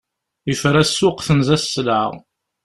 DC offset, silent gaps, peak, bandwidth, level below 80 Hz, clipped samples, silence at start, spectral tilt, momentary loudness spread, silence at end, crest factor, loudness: under 0.1%; none; -2 dBFS; 13 kHz; -46 dBFS; under 0.1%; 0.45 s; -5 dB/octave; 9 LU; 0.45 s; 18 dB; -17 LUFS